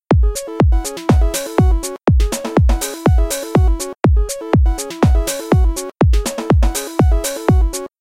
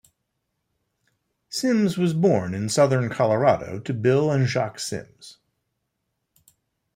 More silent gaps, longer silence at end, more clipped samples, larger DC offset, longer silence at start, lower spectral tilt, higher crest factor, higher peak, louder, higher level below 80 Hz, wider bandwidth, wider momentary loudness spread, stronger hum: neither; second, 0.15 s vs 1.65 s; neither; first, 0.1% vs under 0.1%; second, 0.1 s vs 1.5 s; about the same, -6 dB/octave vs -6 dB/octave; about the same, 14 dB vs 18 dB; first, 0 dBFS vs -6 dBFS; first, -16 LUFS vs -22 LUFS; first, -16 dBFS vs -62 dBFS; about the same, 16.5 kHz vs 16 kHz; second, 3 LU vs 11 LU; neither